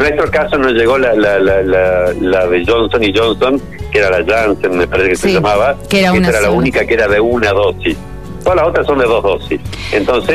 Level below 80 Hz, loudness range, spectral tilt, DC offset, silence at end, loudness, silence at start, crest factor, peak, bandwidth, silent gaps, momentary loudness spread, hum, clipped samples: -30 dBFS; 1 LU; -5.5 dB/octave; 2%; 0 s; -12 LUFS; 0 s; 10 dB; -2 dBFS; 14 kHz; none; 6 LU; none; under 0.1%